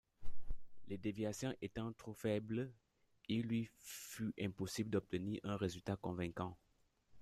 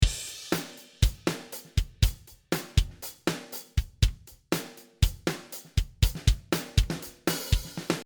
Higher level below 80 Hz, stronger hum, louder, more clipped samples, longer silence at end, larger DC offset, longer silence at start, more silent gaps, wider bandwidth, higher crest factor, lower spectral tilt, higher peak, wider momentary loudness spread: second, -58 dBFS vs -32 dBFS; neither; second, -44 LUFS vs -30 LUFS; neither; about the same, 0 s vs 0 s; neither; first, 0.2 s vs 0 s; neither; second, 15 kHz vs over 20 kHz; about the same, 16 dB vs 20 dB; first, -6 dB/octave vs -4.5 dB/octave; second, -26 dBFS vs -8 dBFS; first, 15 LU vs 9 LU